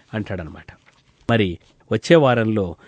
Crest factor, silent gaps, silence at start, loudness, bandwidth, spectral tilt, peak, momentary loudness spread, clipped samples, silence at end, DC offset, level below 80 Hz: 20 dB; none; 0.15 s; -19 LUFS; 9.2 kHz; -6.5 dB/octave; -2 dBFS; 18 LU; under 0.1%; 0.15 s; under 0.1%; -48 dBFS